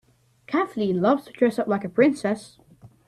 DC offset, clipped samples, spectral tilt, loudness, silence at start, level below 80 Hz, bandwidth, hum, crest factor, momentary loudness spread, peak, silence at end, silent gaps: under 0.1%; under 0.1%; -7 dB/octave; -23 LUFS; 0.5 s; -64 dBFS; 13 kHz; none; 18 dB; 7 LU; -6 dBFS; 0.2 s; none